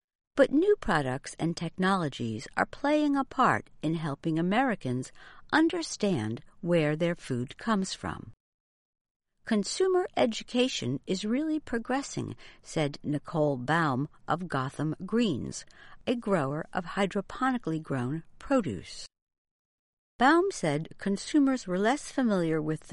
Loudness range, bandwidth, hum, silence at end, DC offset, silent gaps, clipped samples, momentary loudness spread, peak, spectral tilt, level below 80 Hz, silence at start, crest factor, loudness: 4 LU; 11.5 kHz; none; 0 s; under 0.1%; 8.40-8.93 s, 9.01-9.20 s, 19.22-19.27 s, 19.38-19.45 s, 19.51-20.19 s; under 0.1%; 11 LU; -8 dBFS; -5.5 dB/octave; -56 dBFS; 0.35 s; 22 dB; -29 LUFS